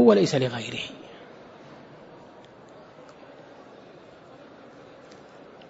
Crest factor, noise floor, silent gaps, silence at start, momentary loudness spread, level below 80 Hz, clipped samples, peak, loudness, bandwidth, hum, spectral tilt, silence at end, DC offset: 24 dB; -49 dBFS; none; 0 s; 23 LU; -70 dBFS; under 0.1%; -4 dBFS; -25 LUFS; 8 kHz; none; -6 dB/octave; 3.95 s; under 0.1%